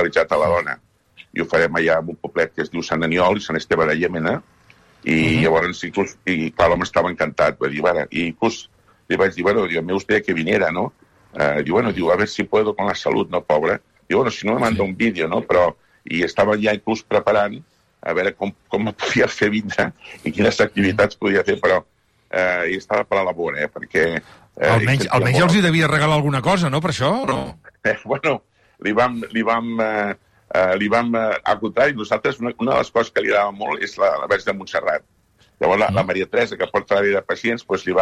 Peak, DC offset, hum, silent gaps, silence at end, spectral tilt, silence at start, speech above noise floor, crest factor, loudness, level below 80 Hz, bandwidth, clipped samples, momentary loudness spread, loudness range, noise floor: -4 dBFS; under 0.1%; none; none; 0 s; -5.5 dB/octave; 0 s; 33 dB; 14 dB; -19 LUFS; -50 dBFS; 13 kHz; under 0.1%; 7 LU; 3 LU; -52 dBFS